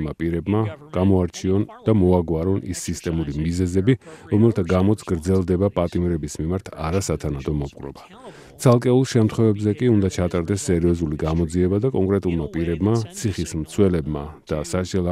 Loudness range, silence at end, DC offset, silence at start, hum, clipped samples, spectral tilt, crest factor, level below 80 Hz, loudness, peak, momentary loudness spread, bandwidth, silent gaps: 3 LU; 0 s; under 0.1%; 0 s; none; under 0.1%; -7 dB/octave; 18 dB; -42 dBFS; -21 LUFS; -2 dBFS; 8 LU; 14.5 kHz; none